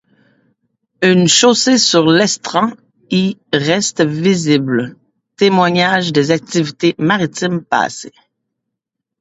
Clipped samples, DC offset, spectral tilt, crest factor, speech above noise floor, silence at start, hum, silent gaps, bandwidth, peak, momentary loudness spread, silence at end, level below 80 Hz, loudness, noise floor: under 0.1%; under 0.1%; -4 dB/octave; 14 dB; 66 dB; 1 s; none; none; 8 kHz; 0 dBFS; 9 LU; 1.1 s; -58 dBFS; -13 LUFS; -79 dBFS